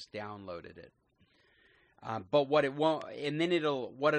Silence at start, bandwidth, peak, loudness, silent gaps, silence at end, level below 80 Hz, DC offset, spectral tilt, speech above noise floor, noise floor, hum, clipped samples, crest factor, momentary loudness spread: 0 s; 9.4 kHz; -14 dBFS; -32 LUFS; none; 0 s; -74 dBFS; under 0.1%; -6 dB/octave; 36 dB; -69 dBFS; none; under 0.1%; 20 dB; 17 LU